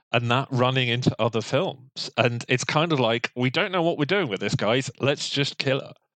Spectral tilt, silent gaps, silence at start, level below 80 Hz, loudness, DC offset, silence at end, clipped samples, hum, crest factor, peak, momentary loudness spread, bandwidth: -5 dB/octave; none; 0.1 s; -62 dBFS; -24 LUFS; under 0.1%; 0.25 s; under 0.1%; none; 20 dB; -4 dBFS; 4 LU; 9.2 kHz